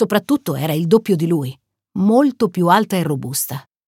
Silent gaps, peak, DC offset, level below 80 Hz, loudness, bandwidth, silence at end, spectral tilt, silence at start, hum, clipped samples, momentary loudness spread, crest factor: none; -2 dBFS; under 0.1%; -60 dBFS; -17 LUFS; 17 kHz; 0.25 s; -6 dB/octave; 0 s; none; under 0.1%; 7 LU; 16 dB